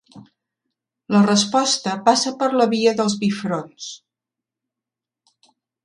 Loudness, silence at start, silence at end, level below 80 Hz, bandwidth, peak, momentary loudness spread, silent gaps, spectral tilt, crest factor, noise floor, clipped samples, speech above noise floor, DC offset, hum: -18 LUFS; 0.15 s; 1.9 s; -66 dBFS; 11 kHz; -2 dBFS; 12 LU; none; -4 dB/octave; 18 dB; -87 dBFS; under 0.1%; 68 dB; under 0.1%; none